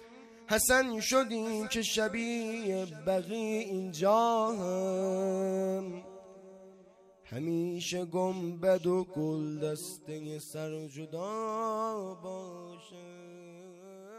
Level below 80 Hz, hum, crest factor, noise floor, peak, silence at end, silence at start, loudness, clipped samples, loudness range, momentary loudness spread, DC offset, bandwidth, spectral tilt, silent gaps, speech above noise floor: -64 dBFS; none; 20 dB; -59 dBFS; -14 dBFS; 0 s; 0 s; -32 LUFS; under 0.1%; 8 LU; 23 LU; under 0.1%; 15.5 kHz; -4 dB/octave; none; 27 dB